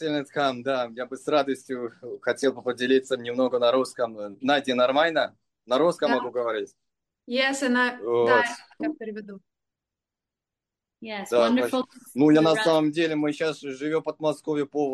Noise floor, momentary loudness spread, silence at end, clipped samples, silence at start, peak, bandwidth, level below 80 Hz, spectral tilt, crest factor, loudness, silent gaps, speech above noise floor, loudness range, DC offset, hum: -89 dBFS; 12 LU; 0 s; under 0.1%; 0 s; -8 dBFS; 12.5 kHz; -74 dBFS; -4.5 dB/octave; 18 dB; -25 LUFS; none; 64 dB; 5 LU; under 0.1%; none